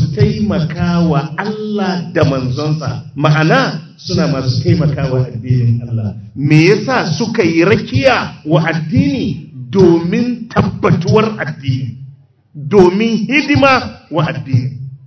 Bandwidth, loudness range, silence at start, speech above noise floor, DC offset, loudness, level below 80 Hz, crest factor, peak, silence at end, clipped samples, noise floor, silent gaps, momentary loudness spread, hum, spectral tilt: 8 kHz; 2 LU; 0 s; 27 dB; under 0.1%; -14 LUFS; -38 dBFS; 14 dB; 0 dBFS; 0.1 s; 0.3%; -40 dBFS; none; 10 LU; none; -7 dB/octave